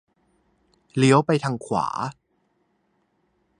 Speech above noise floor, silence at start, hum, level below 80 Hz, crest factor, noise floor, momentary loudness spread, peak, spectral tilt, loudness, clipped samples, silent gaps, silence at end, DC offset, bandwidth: 48 dB; 0.95 s; none; -64 dBFS; 22 dB; -69 dBFS; 14 LU; -2 dBFS; -6 dB/octave; -22 LUFS; under 0.1%; none; 1.45 s; under 0.1%; 11 kHz